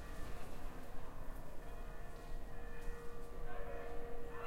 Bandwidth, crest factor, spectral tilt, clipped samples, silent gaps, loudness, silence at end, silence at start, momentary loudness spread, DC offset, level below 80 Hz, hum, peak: 15.5 kHz; 12 dB; -5.5 dB/octave; under 0.1%; none; -52 LUFS; 0 s; 0 s; 4 LU; under 0.1%; -48 dBFS; none; -28 dBFS